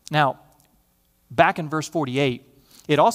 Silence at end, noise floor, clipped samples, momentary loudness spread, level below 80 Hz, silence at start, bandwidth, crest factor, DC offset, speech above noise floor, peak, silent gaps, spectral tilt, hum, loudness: 0 s; -64 dBFS; under 0.1%; 16 LU; -60 dBFS; 0.1 s; 16 kHz; 22 dB; under 0.1%; 43 dB; 0 dBFS; none; -5.5 dB/octave; none; -22 LUFS